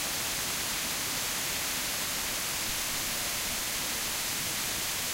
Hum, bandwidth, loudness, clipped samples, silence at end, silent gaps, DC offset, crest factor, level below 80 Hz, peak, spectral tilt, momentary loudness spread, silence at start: none; 16 kHz; -30 LUFS; under 0.1%; 0 s; none; under 0.1%; 14 dB; -52 dBFS; -18 dBFS; -0.5 dB/octave; 0 LU; 0 s